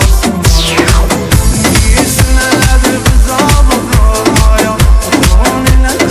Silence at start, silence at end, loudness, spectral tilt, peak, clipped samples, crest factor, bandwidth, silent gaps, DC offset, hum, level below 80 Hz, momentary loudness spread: 0 s; 0 s; -9 LUFS; -4.5 dB/octave; 0 dBFS; 2%; 6 dB; 16 kHz; none; under 0.1%; none; -10 dBFS; 2 LU